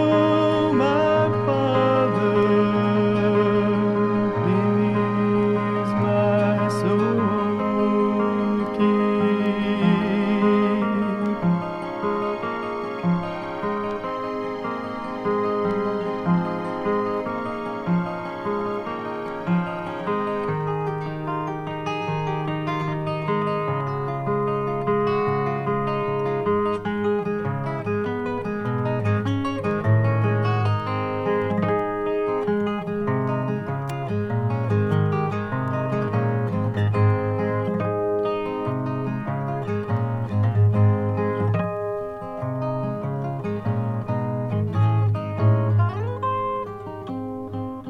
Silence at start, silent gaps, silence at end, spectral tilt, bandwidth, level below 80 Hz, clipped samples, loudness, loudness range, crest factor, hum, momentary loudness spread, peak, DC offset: 0 s; none; 0 s; -9 dB/octave; 9 kHz; -54 dBFS; under 0.1%; -23 LUFS; 6 LU; 16 dB; none; 8 LU; -6 dBFS; under 0.1%